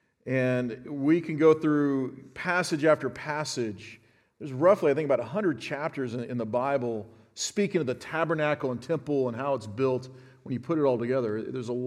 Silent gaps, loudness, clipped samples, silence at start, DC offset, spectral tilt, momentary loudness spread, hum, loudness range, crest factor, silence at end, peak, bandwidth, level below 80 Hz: none; -28 LUFS; under 0.1%; 0.25 s; under 0.1%; -6 dB/octave; 12 LU; none; 4 LU; 20 dB; 0 s; -8 dBFS; 13.5 kHz; -72 dBFS